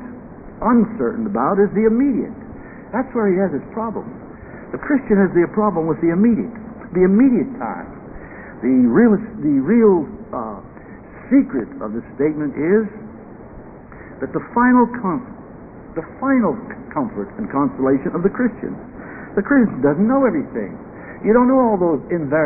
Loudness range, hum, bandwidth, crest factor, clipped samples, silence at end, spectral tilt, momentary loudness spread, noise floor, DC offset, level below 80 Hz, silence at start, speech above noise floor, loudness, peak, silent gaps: 4 LU; none; 2.7 kHz; 16 dB; under 0.1%; 0 s; -15.5 dB/octave; 22 LU; -38 dBFS; under 0.1%; -46 dBFS; 0 s; 21 dB; -18 LUFS; -2 dBFS; none